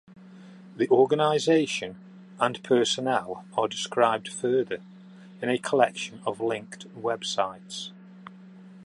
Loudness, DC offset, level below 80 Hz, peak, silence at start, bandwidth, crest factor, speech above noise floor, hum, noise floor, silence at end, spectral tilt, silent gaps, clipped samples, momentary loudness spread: -26 LUFS; under 0.1%; -74 dBFS; -4 dBFS; 0.1 s; 11.5 kHz; 22 dB; 22 dB; none; -48 dBFS; 0 s; -4 dB/octave; none; under 0.1%; 18 LU